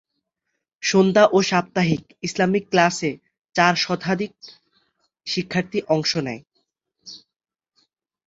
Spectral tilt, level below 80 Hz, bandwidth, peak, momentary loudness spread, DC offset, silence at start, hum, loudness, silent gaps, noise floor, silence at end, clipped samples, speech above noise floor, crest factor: -4.5 dB/octave; -60 dBFS; 8 kHz; -2 dBFS; 18 LU; under 0.1%; 0.8 s; none; -21 LUFS; none; -79 dBFS; 1.1 s; under 0.1%; 59 dB; 22 dB